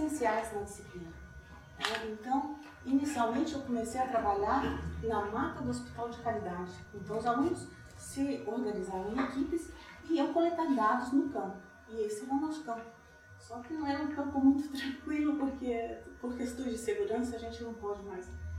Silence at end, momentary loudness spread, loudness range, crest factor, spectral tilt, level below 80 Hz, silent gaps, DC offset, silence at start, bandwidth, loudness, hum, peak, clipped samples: 0 s; 15 LU; 3 LU; 20 dB; -5.5 dB/octave; -56 dBFS; none; under 0.1%; 0 s; 14.5 kHz; -35 LUFS; none; -14 dBFS; under 0.1%